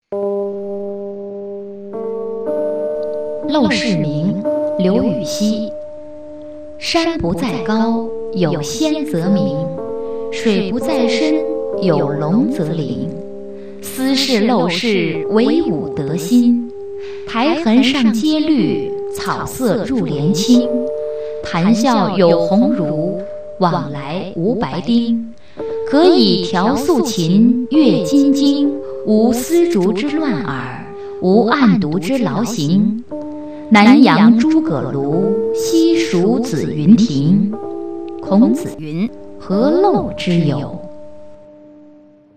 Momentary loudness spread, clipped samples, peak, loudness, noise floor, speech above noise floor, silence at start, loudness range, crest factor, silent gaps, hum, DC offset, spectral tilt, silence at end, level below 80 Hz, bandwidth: 14 LU; under 0.1%; 0 dBFS; -15 LUFS; -44 dBFS; 30 dB; 0 s; 6 LU; 16 dB; none; none; 2%; -6 dB/octave; 0 s; -48 dBFS; 15 kHz